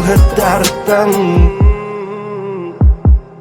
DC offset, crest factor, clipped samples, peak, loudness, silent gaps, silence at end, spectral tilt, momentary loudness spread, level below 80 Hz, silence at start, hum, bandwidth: under 0.1%; 10 dB; under 0.1%; 0 dBFS; -13 LUFS; none; 0 s; -6 dB/octave; 12 LU; -14 dBFS; 0 s; none; 18.5 kHz